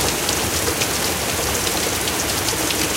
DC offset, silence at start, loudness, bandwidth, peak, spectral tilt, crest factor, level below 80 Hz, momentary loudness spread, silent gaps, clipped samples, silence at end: under 0.1%; 0 s; -19 LUFS; 17 kHz; 0 dBFS; -2 dB/octave; 20 dB; -36 dBFS; 1 LU; none; under 0.1%; 0 s